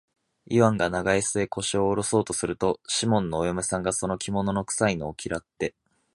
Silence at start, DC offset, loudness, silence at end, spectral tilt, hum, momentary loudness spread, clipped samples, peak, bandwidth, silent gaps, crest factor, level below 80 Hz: 0.5 s; under 0.1%; -26 LUFS; 0.45 s; -4.5 dB/octave; none; 9 LU; under 0.1%; -4 dBFS; 11.5 kHz; none; 22 dB; -50 dBFS